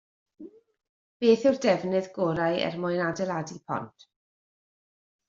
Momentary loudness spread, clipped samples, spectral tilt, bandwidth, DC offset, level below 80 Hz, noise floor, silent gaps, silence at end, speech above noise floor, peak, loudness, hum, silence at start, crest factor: 12 LU; under 0.1%; -4.5 dB/octave; 7.6 kHz; under 0.1%; -68 dBFS; under -90 dBFS; 0.89-1.20 s; 1.4 s; over 64 dB; -8 dBFS; -27 LUFS; none; 0.4 s; 20 dB